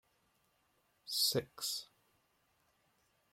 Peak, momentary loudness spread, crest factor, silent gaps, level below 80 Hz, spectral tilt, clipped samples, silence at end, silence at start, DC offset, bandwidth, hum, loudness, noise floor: -22 dBFS; 11 LU; 22 dB; none; -80 dBFS; -2 dB/octave; under 0.1%; 1.5 s; 1.05 s; under 0.1%; 16.5 kHz; none; -36 LUFS; -77 dBFS